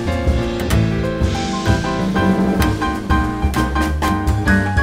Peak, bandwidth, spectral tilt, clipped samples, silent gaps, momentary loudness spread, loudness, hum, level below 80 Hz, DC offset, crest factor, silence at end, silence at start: -2 dBFS; 16 kHz; -6 dB/octave; under 0.1%; none; 3 LU; -18 LUFS; none; -24 dBFS; under 0.1%; 16 dB; 0 s; 0 s